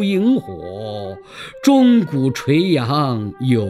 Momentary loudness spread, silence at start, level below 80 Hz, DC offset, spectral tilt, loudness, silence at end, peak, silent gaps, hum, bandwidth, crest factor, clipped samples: 17 LU; 0 s; -56 dBFS; under 0.1%; -7 dB/octave; -16 LUFS; 0 s; -2 dBFS; none; none; 13.5 kHz; 16 dB; under 0.1%